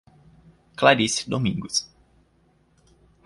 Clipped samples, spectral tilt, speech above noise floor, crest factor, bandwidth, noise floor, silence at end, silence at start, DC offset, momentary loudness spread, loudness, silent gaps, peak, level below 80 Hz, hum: under 0.1%; -3.5 dB/octave; 40 dB; 24 dB; 11.5 kHz; -62 dBFS; 1.4 s; 0.8 s; under 0.1%; 19 LU; -22 LUFS; none; -2 dBFS; -56 dBFS; none